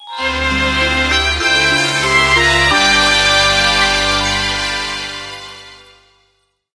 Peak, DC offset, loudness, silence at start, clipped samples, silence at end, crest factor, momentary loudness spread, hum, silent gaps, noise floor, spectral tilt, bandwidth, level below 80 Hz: 0 dBFS; under 0.1%; -12 LUFS; 0 s; under 0.1%; 1 s; 14 dB; 12 LU; 50 Hz at -35 dBFS; none; -61 dBFS; -2 dB/octave; 11 kHz; -30 dBFS